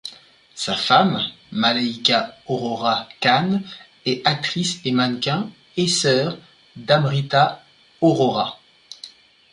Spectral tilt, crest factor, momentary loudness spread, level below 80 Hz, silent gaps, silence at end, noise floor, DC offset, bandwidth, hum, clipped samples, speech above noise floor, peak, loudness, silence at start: -4.5 dB/octave; 20 dB; 16 LU; -62 dBFS; none; 0.45 s; -47 dBFS; under 0.1%; 11.5 kHz; none; under 0.1%; 27 dB; -2 dBFS; -20 LUFS; 0.05 s